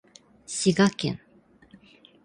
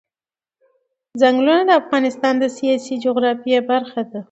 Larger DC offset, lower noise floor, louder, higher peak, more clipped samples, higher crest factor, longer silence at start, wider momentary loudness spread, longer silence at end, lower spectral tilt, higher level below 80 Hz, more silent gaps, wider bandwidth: neither; second, -55 dBFS vs under -90 dBFS; second, -25 LUFS vs -17 LUFS; second, -8 dBFS vs 0 dBFS; neither; about the same, 20 dB vs 18 dB; second, 0.5 s vs 1.15 s; first, 14 LU vs 7 LU; first, 1.1 s vs 0.1 s; about the same, -4.5 dB/octave vs -4.5 dB/octave; first, -62 dBFS vs -72 dBFS; neither; first, 11 kHz vs 8.2 kHz